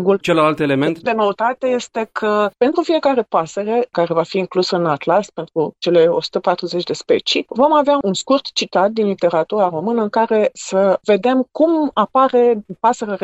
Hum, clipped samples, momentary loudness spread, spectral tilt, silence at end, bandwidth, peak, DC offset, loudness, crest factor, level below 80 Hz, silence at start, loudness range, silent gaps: none; under 0.1%; 5 LU; -5 dB/octave; 0.05 s; 9.2 kHz; -2 dBFS; under 0.1%; -17 LUFS; 14 dB; -62 dBFS; 0 s; 2 LU; none